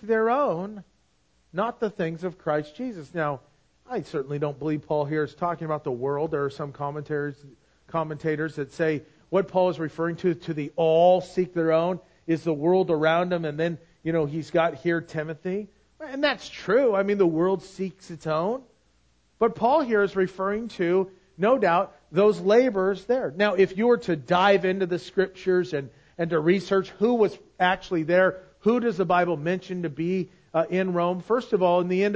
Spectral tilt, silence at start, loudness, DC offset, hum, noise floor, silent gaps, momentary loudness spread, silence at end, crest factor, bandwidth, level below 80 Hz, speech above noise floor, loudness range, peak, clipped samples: -7 dB/octave; 0 s; -25 LUFS; under 0.1%; none; -67 dBFS; none; 11 LU; 0 s; 18 dB; 8 kHz; -62 dBFS; 42 dB; 7 LU; -6 dBFS; under 0.1%